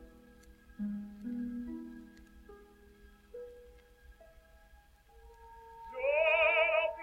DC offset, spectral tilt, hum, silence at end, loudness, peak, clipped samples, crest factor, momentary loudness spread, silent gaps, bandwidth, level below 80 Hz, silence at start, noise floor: under 0.1%; -5.5 dB/octave; none; 0 s; -32 LUFS; -18 dBFS; under 0.1%; 20 dB; 26 LU; none; 13.5 kHz; -60 dBFS; 0 s; -61 dBFS